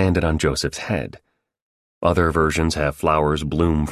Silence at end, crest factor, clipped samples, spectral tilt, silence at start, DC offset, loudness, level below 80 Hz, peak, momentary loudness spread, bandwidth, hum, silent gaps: 0 s; 18 dB; under 0.1%; -5.5 dB/octave; 0 s; under 0.1%; -20 LUFS; -30 dBFS; -2 dBFS; 7 LU; 14 kHz; none; 1.62-2.01 s